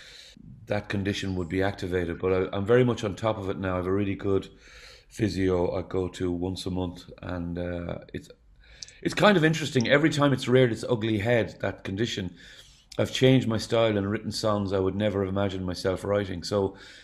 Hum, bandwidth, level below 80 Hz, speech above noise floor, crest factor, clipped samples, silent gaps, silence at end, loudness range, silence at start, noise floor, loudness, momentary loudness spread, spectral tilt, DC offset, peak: none; 14.5 kHz; -52 dBFS; 22 dB; 22 dB; under 0.1%; none; 0 s; 6 LU; 0 s; -48 dBFS; -26 LUFS; 13 LU; -6 dB/octave; under 0.1%; -4 dBFS